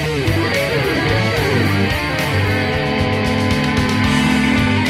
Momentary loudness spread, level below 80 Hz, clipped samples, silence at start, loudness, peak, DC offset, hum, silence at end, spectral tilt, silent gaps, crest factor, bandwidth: 3 LU; -32 dBFS; under 0.1%; 0 s; -16 LUFS; -2 dBFS; under 0.1%; none; 0 s; -5.5 dB/octave; none; 14 dB; 15.5 kHz